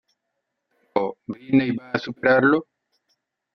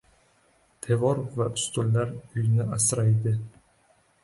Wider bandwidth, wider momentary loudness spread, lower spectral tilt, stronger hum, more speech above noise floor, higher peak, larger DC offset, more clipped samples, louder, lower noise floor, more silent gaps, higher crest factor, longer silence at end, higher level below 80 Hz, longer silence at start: second, 6.2 kHz vs 11.5 kHz; about the same, 11 LU vs 9 LU; first, -8 dB/octave vs -5.5 dB/octave; neither; first, 58 dB vs 39 dB; first, -4 dBFS vs -12 dBFS; neither; neither; first, -22 LUFS vs -26 LUFS; first, -79 dBFS vs -64 dBFS; neither; about the same, 20 dB vs 16 dB; first, 0.9 s vs 0.75 s; second, -66 dBFS vs -58 dBFS; about the same, 0.95 s vs 0.85 s